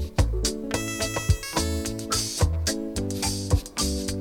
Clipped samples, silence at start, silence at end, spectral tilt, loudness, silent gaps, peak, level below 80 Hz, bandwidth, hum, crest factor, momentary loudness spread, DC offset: under 0.1%; 0 s; 0 s; -4 dB/octave; -26 LUFS; none; -8 dBFS; -32 dBFS; 19 kHz; none; 18 dB; 4 LU; under 0.1%